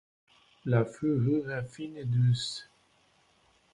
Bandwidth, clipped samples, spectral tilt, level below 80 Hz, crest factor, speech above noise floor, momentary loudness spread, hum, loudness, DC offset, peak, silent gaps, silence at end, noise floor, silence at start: 10.5 kHz; under 0.1%; -7 dB/octave; -64 dBFS; 20 dB; 38 dB; 13 LU; none; -30 LUFS; under 0.1%; -12 dBFS; none; 1.1 s; -67 dBFS; 0.65 s